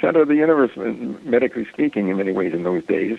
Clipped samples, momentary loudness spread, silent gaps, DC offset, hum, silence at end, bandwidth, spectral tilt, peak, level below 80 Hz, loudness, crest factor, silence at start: under 0.1%; 9 LU; none; under 0.1%; none; 0 s; 5.4 kHz; -8.5 dB/octave; -4 dBFS; -60 dBFS; -20 LUFS; 16 dB; 0 s